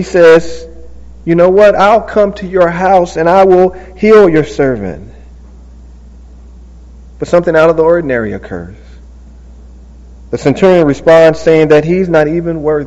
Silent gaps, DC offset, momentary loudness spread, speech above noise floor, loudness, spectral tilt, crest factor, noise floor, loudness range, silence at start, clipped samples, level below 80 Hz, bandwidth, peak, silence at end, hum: none; under 0.1%; 17 LU; 25 dB; -9 LUFS; -7 dB/octave; 10 dB; -33 dBFS; 6 LU; 0 s; 2%; -34 dBFS; 8.2 kHz; 0 dBFS; 0 s; none